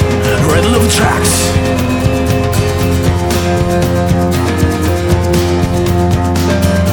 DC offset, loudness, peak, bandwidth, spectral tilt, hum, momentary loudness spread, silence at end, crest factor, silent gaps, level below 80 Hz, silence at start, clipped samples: under 0.1%; -12 LUFS; 0 dBFS; 18 kHz; -5.5 dB/octave; none; 3 LU; 0 s; 12 dB; none; -24 dBFS; 0 s; under 0.1%